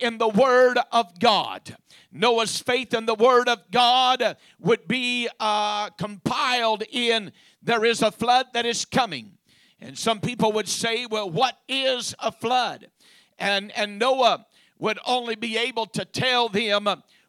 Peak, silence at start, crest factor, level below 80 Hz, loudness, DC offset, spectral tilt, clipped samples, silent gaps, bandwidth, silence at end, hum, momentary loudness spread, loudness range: -6 dBFS; 0 s; 18 dB; -68 dBFS; -22 LUFS; under 0.1%; -3 dB/octave; under 0.1%; none; 14.5 kHz; 0.3 s; none; 10 LU; 4 LU